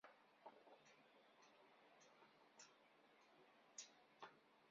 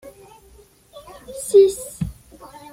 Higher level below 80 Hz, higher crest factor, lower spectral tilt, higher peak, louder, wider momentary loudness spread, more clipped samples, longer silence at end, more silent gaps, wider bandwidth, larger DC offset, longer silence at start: second, under -90 dBFS vs -46 dBFS; first, 26 dB vs 18 dB; second, -0.5 dB/octave vs -5.5 dB/octave; second, -42 dBFS vs -4 dBFS; second, -65 LUFS vs -18 LUFS; second, 9 LU vs 26 LU; neither; second, 0 s vs 0.6 s; neither; second, 7.2 kHz vs 15.5 kHz; neither; second, 0.05 s vs 1.3 s